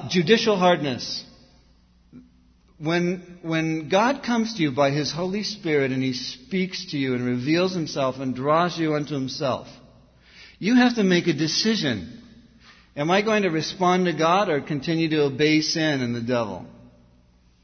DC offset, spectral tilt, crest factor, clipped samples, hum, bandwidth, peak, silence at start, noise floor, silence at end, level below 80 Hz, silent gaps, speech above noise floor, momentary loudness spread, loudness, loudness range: under 0.1%; -5 dB/octave; 22 dB; under 0.1%; none; 6.6 kHz; -2 dBFS; 0 s; -57 dBFS; 0.9 s; -58 dBFS; none; 35 dB; 9 LU; -23 LUFS; 4 LU